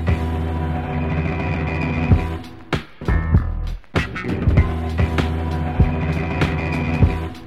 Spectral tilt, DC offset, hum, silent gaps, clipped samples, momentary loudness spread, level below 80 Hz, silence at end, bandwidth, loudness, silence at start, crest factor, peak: -8 dB/octave; 0.8%; none; none; under 0.1%; 6 LU; -26 dBFS; 0 s; 8.8 kHz; -21 LUFS; 0 s; 18 dB; -2 dBFS